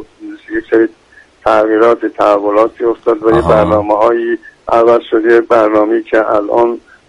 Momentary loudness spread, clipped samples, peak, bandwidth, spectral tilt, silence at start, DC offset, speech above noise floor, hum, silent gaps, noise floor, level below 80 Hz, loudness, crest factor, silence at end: 9 LU; 0.1%; 0 dBFS; 9.6 kHz; -7.5 dB/octave; 0 s; under 0.1%; 20 dB; none; none; -30 dBFS; -40 dBFS; -11 LUFS; 12 dB; 0.3 s